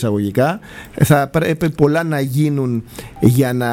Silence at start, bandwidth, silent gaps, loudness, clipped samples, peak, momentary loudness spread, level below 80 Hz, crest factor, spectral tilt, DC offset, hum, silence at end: 0 s; 17 kHz; none; -16 LUFS; under 0.1%; 0 dBFS; 10 LU; -42 dBFS; 16 dB; -7 dB/octave; under 0.1%; none; 0 s